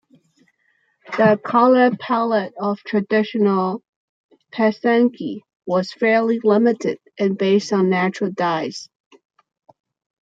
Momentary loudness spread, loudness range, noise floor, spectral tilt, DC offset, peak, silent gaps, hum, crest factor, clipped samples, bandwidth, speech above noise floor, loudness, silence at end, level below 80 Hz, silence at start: 12 LU; 3 LU; -65 dBFS; -6.5 dB/octave; under 0.1%; -2 dBFS; 3.88-4.29 s, 5.56-5.60 s; none; 18 dB; under 0.1%; 7.8 kHz; 47 dB; -19 LUFS; 1.4 s; -70 dBFS; 1.1 s